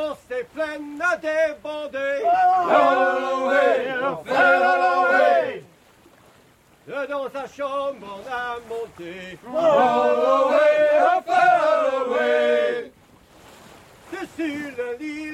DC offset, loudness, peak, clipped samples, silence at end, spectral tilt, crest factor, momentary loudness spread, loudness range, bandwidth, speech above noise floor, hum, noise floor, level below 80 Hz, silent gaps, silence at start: under 0.1%; -20 LUFS; -4 dBFS; under 0.1%; 0 s; -4 dB/octave; 18 dB; 15 LU; 11 LU; 13.5 kHz; 34 dB; none; -55 dBFS; -64 dBFS; none; 0 s